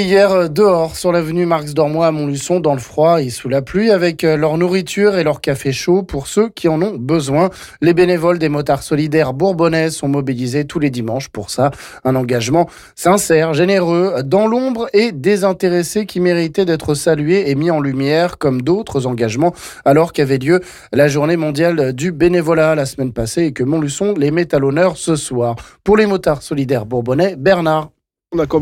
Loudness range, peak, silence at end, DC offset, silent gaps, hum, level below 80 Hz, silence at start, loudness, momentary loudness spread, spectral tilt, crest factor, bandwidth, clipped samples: 2 LU; -2 dBFS; 0 s; under 0.1%; none; none; -44 dBFS; 0 s; -15 LUFS; 6 LU; -6 dB/octave; 12 dB; 16.5 kHz; under 0.1%